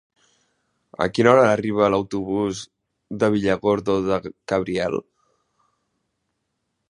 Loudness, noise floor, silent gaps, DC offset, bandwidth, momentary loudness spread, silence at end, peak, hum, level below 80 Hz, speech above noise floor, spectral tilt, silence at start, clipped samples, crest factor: -21 LUFS; -76 dBFS; none; under 0.1%; 11 kHz; 14 LU; 1.9 s; 0 dBFS; none; -54 dBFS; 56 dB; -6 dB/octave; 1 s; under 0.1%; 22 dB